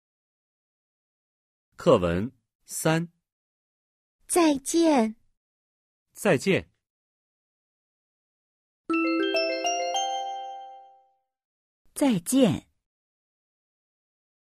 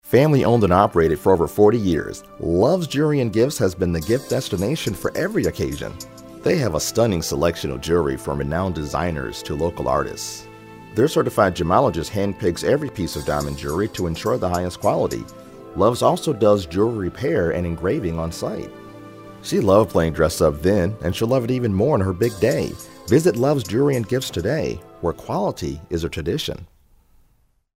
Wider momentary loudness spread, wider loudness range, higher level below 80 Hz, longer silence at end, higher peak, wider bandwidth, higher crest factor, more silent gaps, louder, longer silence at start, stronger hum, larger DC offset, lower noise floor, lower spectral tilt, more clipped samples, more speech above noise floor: first, 15 LU vs 12 LU; about the same, 5 LU vs 4 LU; second, -60 dBFS vs -40 dBFS; first, 2 s vs 1.1 s; second, -8 dBFS vs 0 dBFS; about the same, 15.5 kHz vs 16 kHz; about the same, 22 dB vs 20 dB; first, 2.55-2.59 s, 3.32-4.19 s, 5.37-6.06 s, 6.90-8.84 s, 11.45-11.85 s vs none; second, -25 LUFS vs -21 LUFS; first, 1.8 s vs 0.05 s; first, 60 Hz at -65 dBFS vs none; neither; first, -65 dBFS vs -61 dBFS; second, -4.5 dB/octave vs -6 dB/octave; neither; about the same, 42 dB vs 41 dB